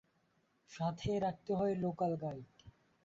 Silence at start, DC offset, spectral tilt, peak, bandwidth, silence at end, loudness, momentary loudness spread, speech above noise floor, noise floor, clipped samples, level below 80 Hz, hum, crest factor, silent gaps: 0.7 s; under 0.1%; -7 dB/octave; -24 dBFS; 7.6 kHz; 0.35 s; -38 LUFS; 10 LU; 39 dB; -76 dBFS; under 0.1%; -64 dBFS; none; 14 dB; none